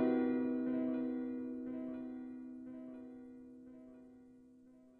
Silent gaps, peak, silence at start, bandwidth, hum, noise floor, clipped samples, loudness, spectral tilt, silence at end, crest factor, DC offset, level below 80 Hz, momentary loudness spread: none; -24 dBFS; 0 s; 4.2 kHz; none; -62 dBFS; under 0.1%; -40 LUFS; -9 dB/octave; 0 s; 18 dB; under 0.1%; -76 dBFS; 22 LU